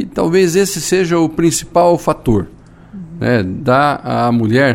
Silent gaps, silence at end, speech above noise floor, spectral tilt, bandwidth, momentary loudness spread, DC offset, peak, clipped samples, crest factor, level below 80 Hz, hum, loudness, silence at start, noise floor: none; 0 s; 21 dB; -5.5 dB/octave; 16.5 kHz; 6 LU; under 0.1%; 0 dBFS; under 0.1%; 14 dB; -38 dBFS; none; -14 LUFS; 0 s; -33 dBFS